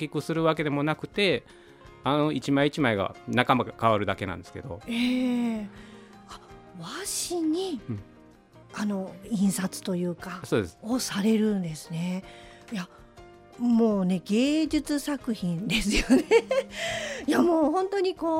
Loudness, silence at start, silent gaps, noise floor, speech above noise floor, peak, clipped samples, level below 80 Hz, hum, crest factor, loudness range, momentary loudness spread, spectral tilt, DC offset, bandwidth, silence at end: -27 LUFS; 0 s; none; -53 dBFS; 27 dB; -4 dBFS; under 0.1%; -48 dBFS; none; 24 dB; 6 LU; 15 LU; -5 dB/octave; under 0.1%; 16 kHz; 0 s